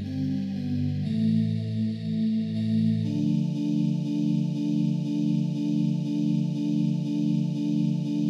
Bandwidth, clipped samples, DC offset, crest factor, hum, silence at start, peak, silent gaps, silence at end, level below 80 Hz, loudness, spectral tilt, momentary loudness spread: 7.8 kHz; under 0.1%; under 0.1%; 12 dB; none; 0 s; -14 dBFS; none; 0 s; -78 dBFS; -26 LUFS; -8.5 dB/octave; 4 LU